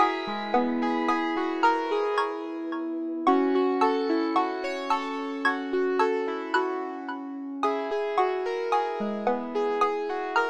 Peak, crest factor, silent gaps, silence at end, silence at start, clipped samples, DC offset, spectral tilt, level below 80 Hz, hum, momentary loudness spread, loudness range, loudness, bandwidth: -8 dBFS; 18 dB; none; 0 s; 0 s; under 0.1%; under 0.1%; -5 dB/octave; -68 dBFS; none; 8 LU; 3 LU; -27 LUFS; 9.6 kHz